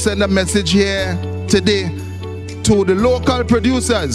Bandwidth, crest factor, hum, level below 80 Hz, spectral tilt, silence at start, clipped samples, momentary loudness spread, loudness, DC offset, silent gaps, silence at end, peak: 14 kHz; 16 dB; none; -32 dBFS; -5 dB/octave; 0 s; under 0.1%; 11 LU; -15 LUFS; under 0.1%; none; 0 s; 0 dBFS